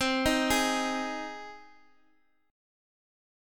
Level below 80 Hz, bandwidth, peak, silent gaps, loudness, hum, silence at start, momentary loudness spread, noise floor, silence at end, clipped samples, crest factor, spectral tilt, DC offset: -52 dBFS; 17.5 kHz; -12 dBFS; none; -28 LUFS; none; 0 s; 17 LU; -71 dBFS; 1.85 s; under 0.1%; 20 dB; -2.5 dB/octave; under 0.1%